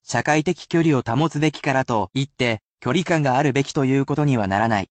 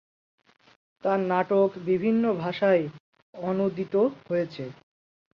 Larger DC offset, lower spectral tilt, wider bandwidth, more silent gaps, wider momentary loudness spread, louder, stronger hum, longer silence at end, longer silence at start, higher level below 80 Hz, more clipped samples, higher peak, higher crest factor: neither; second, -6 dB/octave vs -8.5 dB/octave; first, 8.8 kHz vs 6.4 kHz; second, 2.66-2.75 s vs 3.00-3.13 s, 3.22-3.33 s; second, 4 LU vs 11 LU; first, -21 LUFS vs -26 LUFS; neither; second, 0.05 s vs 0.7 s; second, 0.1 s vs 1.05 s; first, -54 dBFS vs -70 dBFS; neither; first, -4 dBFS vs -10 dBFS; about the same, 16 dB vs 18 dB